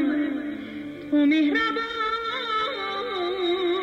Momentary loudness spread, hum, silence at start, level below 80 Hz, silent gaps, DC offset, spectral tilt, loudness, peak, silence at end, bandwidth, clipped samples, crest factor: 12 LU; none; 0 s; -60 dBFS; none; under 0.1%; -4.5 dB/octave; -25 LUFS; -12 dBFS; 0 s; 7.6 kHz; under 0.1%; 12 dB